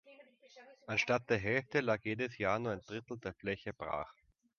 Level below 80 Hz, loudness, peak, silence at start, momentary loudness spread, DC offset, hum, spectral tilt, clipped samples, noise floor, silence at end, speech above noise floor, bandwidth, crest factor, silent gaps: -66 dBFS; -36 LUFS; -18 dBFS; 0.05 s; 11 LU; under 0.1%; none; -4 dB/octave; under 0.1%; -61 dBFS; 0.45 s; 24 dB; 7 kHz; 22 dB; none